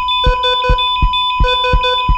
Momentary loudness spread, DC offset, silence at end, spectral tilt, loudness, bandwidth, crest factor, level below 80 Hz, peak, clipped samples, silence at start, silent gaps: 1 LU; under 0.1%; 0 s; -5 dB/octave; -13 LUFS; 8 kHz; 10 dB; -18 dBFS; -2 dBFS; under 0.1%; 0 s; none